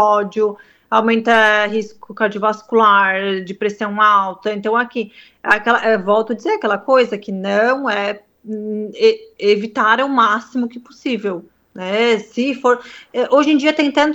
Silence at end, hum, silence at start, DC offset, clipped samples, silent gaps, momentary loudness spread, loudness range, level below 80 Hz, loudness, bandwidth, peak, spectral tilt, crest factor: 0 s; none; 0 s; under 0.1%; under 0.1%; none; 12 LU; 3 LU; -62 dBFS; -16 LUFS; 8.4 kHz; 0 dBFS; -5 dB/octave; 16 dB